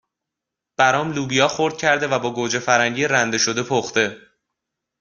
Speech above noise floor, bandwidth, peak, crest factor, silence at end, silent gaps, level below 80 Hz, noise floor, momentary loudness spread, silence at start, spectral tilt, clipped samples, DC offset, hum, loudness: 65 dB; 10.5 kHz; -2 dBFS; 20 dB; 0.85 s; none; -60 dBFS; -84 dBFS; 5 LU; 0.8 s; -3 dB/octave; under 0.1%; under 0.1%; none; -19 LUFS